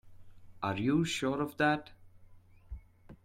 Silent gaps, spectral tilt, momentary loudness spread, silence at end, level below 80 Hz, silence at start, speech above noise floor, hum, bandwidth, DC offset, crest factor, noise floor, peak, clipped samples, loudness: none; -5.5 dB/octave; 22 LU; 0.1 s; -56 dBFS; 0.05 s; 25 dB; none; 16 kHz; under 0.1%; 18 dB; -56 dBFS; -16 dBFS; under 0.1%; -32 LUFS